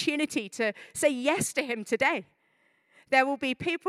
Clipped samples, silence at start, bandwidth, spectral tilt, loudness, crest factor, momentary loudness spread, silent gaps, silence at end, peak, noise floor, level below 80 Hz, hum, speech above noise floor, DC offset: under 0.1%; 0 s; 15.5 kHz; -3 dB/octave; -28 LUFS; 22 dB; 6 LU; none; 0 s; -8 dBFS; -69 dBFS; -70 dBFS; none; 41 dB; under 0.1%